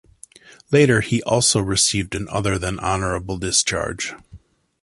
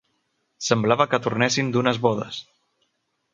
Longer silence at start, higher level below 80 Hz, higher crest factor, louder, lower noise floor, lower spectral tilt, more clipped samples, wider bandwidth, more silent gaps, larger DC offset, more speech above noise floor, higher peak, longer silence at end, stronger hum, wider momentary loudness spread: about the same, 0.7 s vs 0.6 s; first, -40 dBFS vs -64 dBFS; about the same, 18 dB vs 22 dB; first, -19 LUFS vs -22 LUFS; second, -47 dBFS vs -73 dBFS; about the same, -3.5 dB/octave vs -4.5 dB/octave; neither; first, 11.5 kHz vs 9.4 kHz; neither; neither; second, 27 dB vs 51 dB; about the same, -2 dBFS vs -2 dBFS; second, 0.45 s vs 0.9 s; neither; about the same, 9 LU vs 11 LU